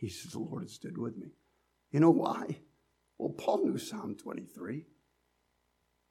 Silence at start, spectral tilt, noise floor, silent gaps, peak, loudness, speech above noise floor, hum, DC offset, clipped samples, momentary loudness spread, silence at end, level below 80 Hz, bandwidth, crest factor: 0 s; -7 dB/octave; -77 dBFS; none; -12 dBFS; -34 LUFS; 44 dB; none; under 0.1%; under 0.1%; 18 LU; 1.25 s; -76 dBFS; 14 kHz; 22 dB